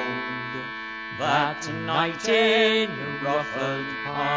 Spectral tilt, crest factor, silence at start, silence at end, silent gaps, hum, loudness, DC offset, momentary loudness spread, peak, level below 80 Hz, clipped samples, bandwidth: -4 dB/octave; 16 dB; 0 s; 0 s; none; none; -24 LUFS; under 0.1%; 12 LU; -8 dBFS; -62 dBFS; under 0.1%; 8 kHz